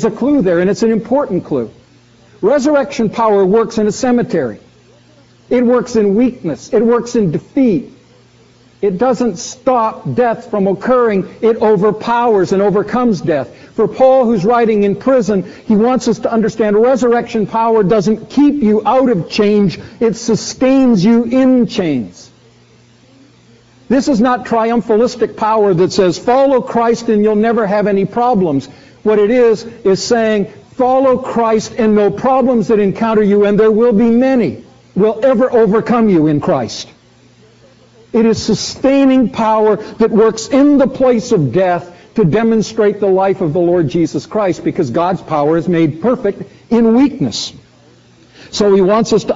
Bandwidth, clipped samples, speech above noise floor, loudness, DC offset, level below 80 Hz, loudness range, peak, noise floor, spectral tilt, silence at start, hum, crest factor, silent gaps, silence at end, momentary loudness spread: 8 kHz; under 0.1%; 34 dB; -13 LUFS; under 0.1%; -46 dBFS; 4 LU; 0 dBFS; -46 dBFS; -6 dB/octave; 0 s; none; 12 dB; none; 0 s; 7 LU